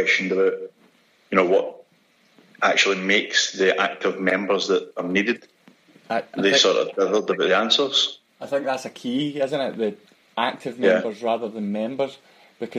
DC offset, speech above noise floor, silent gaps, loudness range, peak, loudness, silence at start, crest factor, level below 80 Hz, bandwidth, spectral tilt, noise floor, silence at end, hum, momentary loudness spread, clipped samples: under 0.1%; 39 dB; none; 4 LU; -4 dBFS; -21 LUFS; 0 s; 20 dB; -74 dBFS; 11 kHz; -3 dB/octave; -60 dBFS; 0 s; none; 11 LU; under 0.1%